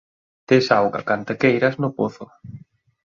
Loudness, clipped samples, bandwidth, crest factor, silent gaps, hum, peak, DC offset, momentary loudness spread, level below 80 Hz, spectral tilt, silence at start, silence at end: -20 LUFS; under 0.1%; 7.4 kHz; 20 dB; none; none; -2 dBFS; under 0.1%; 23 LU; -60 dBFS; -6.5 dB/octave; 0.5 s; 0.6 s